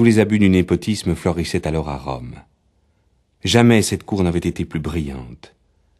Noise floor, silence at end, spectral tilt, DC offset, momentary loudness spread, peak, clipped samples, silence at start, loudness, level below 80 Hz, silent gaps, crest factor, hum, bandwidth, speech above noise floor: -62 dBFS; 0.65 s; -6 dB/octave; under 0.1%; 15 LU; 0 dBFS; under 0.1%; 0 s; -18 LUFS; -38 dBFS; none; 18 dB; none; 13 kHz; 44 dB